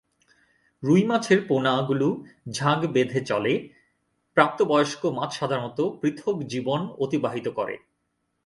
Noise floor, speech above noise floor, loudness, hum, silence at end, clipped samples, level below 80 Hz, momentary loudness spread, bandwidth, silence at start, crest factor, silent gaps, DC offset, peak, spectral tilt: -75 dBFS; 52 dB; -25 LUFS; none; 0.7 s; under 0.1%; -66 dBFS; 8 LU; 11.5 kHz; 0.8 s; 24 dB; none; under 0.1%; -2 dBFS; -6 dB/octave